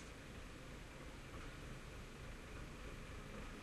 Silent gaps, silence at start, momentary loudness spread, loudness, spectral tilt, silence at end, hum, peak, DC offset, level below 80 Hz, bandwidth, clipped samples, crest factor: none; 0 s; 2 LU; -54 LUFS; -4.5 dB/octave; 0 s; none; -38 dBFS; under 0.1%; -56 dBFS; 13 kHz; under 0.1%; 14 dB